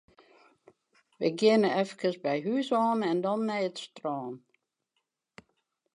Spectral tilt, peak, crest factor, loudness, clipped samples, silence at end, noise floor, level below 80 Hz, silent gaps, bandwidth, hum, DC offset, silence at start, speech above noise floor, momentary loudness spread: -6 dB/octave; -12 dBFS; 20 dB; -29 LUFS; under 0.1%; 1.55 s; -82 dBFS; -82 dBFS; none; 10.5 kHz; none; under 0.1%; 1.2 s; 54 dB; 13 LU